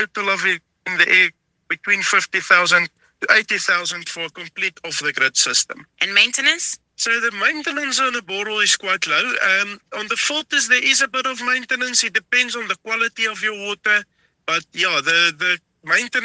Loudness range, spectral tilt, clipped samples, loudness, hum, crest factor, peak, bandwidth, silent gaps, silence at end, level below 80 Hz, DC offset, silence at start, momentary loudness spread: 3 LU; 0 dB/octave; under 0.1%; -18 LUFS; none; 20 dB; 0 dBFS; 10.5 kHz; none; 0 s; -70 dBFS; under 0.1%; 0 s; 10 LU